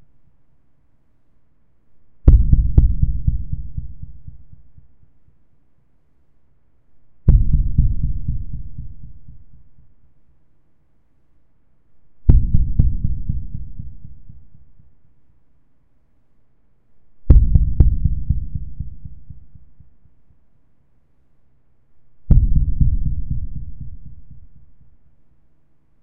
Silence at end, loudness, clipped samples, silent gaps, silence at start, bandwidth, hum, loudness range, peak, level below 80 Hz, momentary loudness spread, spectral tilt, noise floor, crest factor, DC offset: 0 s; -20 LUFS; under 0.1%; none; 0 s; 1.5 kHz; none; 13 LU; 0 dBFS; -22 dBFS; 25 LU; -13.5 dB/octave; -61 dBFS; 20 dB; under 0.1%